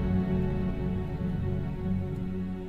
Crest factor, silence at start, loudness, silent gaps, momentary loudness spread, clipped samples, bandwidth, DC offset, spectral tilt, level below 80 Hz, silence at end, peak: 12 dB; 0 s; -31 LUFS; none; 5 LU; under 0.1%; 4.7 kHz; under 0.1%; -10 dB/octave; -38 dBFS; 0 s; -16 dBFS